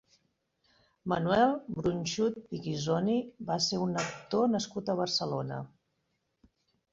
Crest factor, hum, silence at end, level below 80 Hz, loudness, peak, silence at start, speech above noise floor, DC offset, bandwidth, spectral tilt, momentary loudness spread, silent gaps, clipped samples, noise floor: 20 dB; none; 1.25 s; -64 dBFS; -31 LUFS; -12 dBFS; 1.05 s; 48 dB; under 0.1%; 8 kHz; -5 dB/octave; 10 LU; none; under 0.1%; -79 dBFS